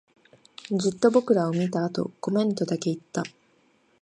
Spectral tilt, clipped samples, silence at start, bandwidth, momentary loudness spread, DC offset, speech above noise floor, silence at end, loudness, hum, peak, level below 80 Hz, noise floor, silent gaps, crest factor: -6.5 dB/octave; under 0.1%; 0.7 s; 11 kHz; 11 LU; under 0.1%; 39 dB; 0.75 s; -25 LUFS; none; -6 dBFS; -70 dBFS; -64 dBFS; none; 20 dB